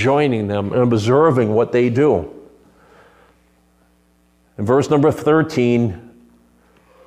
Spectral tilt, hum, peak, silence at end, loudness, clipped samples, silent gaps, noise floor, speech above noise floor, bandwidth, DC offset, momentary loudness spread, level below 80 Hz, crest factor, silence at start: -7.5 dB/octave; none; -2 dBFS; 1.05 s; -16 LUFS; under 0.1%; none; -57 dBFS; 42 dB; 12.5 kHz; under 0.1%; 8 LU; -52 dBFS; 16 dB; 0 s